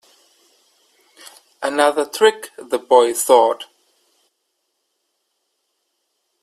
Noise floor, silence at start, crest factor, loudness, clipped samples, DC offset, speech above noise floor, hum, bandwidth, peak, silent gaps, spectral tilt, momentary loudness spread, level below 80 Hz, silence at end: -72 dBFS; 1.6 s; 20 dB; -16 LUFS; under 0.1%; under 0.1%; 56 dB; none; 15.5 kHz; 0 dBFS; none; -1 dB/octave; 15 LU; -70 dBFS; 2.8 s